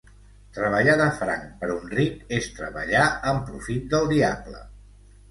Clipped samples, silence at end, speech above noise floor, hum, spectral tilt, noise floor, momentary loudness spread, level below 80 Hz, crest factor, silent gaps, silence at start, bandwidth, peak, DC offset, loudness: under 0.1%; 0.5 s; 26 dB; 50 Hz at -45 dBFS; -5.5 dB/octave; -50 dBFS; 13 LU; -46 dBFS; 18 dB; none; 0.55 s; 11.5 kHz; -6 dBFS; under 0.1%; -24 LUFS